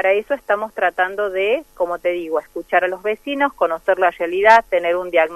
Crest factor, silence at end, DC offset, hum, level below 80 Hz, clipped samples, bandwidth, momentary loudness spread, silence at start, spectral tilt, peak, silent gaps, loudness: 18 dB; 0 s; under 0.1%; none; -54 dBFS; under 0.1%; 13 kHz; 10 LU; 0 s; -4 dB/octave; 0 dBFS; none; -18 LUFS